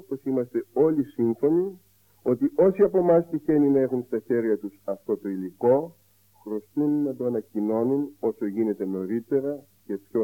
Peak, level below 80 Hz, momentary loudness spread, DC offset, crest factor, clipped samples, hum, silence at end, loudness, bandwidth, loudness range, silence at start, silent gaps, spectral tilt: -8 dBFS; -64 dBFS; 12 LU; under 0.1%; 16 dB; under 0.1%; none; 0 s; -25 LUFS; 17 kHz; 5 LU; 0.1 s; none; -10 dB/octave